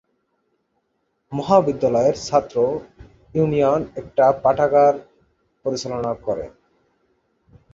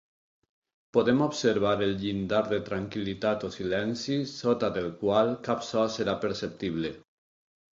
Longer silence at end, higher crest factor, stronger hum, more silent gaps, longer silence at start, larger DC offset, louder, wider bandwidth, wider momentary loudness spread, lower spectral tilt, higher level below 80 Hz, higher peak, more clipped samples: first, 1.25 s vs 0.75 s; about the same, 18 dB vs 18 dB; neither; neither; first, 1.3 s vs 0.95 s; neither; first, -20 LUFS vs -28 LUFS; about the same, 7.8 kHz vs 7.8 kHz; first, 13 LU vs 7 LU; about the same, -6.5 dB/octave vs -5.5 dB/octave; first, -52 dBFS vs -58 dBFS; first, -2 dBFS vs -10 dBFS; neither